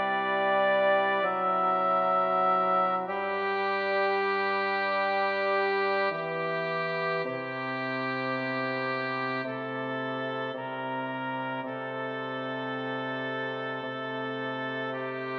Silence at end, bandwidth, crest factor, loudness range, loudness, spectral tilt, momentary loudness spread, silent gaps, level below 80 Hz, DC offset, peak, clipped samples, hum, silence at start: 0 s; 6.6 kHz; 14 dB; 7 LU; -29 LUFS; -7 dB/octave; 9 LU; none; -90 dBFS; under 0.1%; -14 dBFS; under 0.1%; none; 0 s